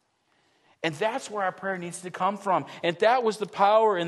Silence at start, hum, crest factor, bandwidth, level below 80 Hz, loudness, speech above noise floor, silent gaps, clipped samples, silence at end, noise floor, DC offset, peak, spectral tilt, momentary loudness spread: 0.85 s; none; 18 dB; 12.5 kHz; -78 dBFS; -26 LUFS; 43 dB; none; under 0.1%; 0 s; -69 dBFS; under 0.1%; -8 dBFS; -4.5 dB/octave; 11 LU